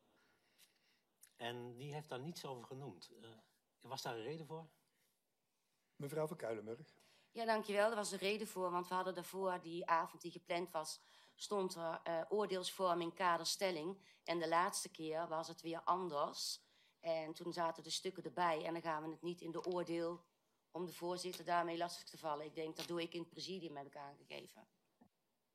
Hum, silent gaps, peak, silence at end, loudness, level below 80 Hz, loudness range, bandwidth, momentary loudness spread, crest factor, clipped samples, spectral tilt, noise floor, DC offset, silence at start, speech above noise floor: none; none; -22 dBFS; 0.9 s; -43 LUFS; under -90 dBFS; 10 LU; 15.5 kHz; 15 LU; 22 dB; under 0.1%; -3.5 dB/octave; -87 dBFS; under 0.1%; 0.6 s; 44 dB